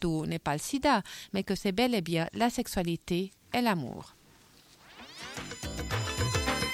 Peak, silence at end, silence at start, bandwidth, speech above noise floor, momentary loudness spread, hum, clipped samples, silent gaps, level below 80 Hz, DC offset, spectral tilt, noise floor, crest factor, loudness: -14 dBFS; 0 s; 0 s; 16.5 kHz; 29 dB; 13 LU; none; under 0.1%; none; -48 dBFS; under 0.1%; -4.5 dB/octave; -59 dBFS; 16 dB; -31 LUFS